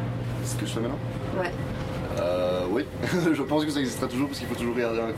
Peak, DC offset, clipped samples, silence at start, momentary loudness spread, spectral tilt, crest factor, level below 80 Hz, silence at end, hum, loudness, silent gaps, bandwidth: -12 dBFS; under 0.1%; under 0.1%; 0 s; 6 LU; -6 dB/octave; 16 dB; -46 dBFS; 0 s; none; -28 LUFS; none; 16 kHz